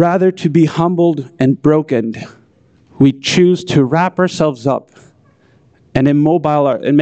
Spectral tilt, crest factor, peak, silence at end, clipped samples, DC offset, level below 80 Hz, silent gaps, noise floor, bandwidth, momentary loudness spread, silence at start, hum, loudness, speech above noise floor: -7 dB/octave; 12 dB; -2 dBFS; 0 s; under 0.1%; under 0.1%; -48 dBFS; none; -50 dBFS; 8.6 kHz; 7 LU; 0 s; none; -14 LUFS; 38 dB